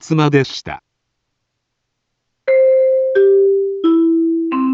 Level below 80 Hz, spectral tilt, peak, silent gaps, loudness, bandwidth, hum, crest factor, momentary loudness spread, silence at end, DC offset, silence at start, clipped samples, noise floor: -56 dBFS; -7.5 dB/octave; -2 dBFS; none; -14 LUFS; 7.6 kHz; none; 14 dB; 14 LU; 0 s; under 0.1%; 0.05 s; under 0.1%; -73 dBFS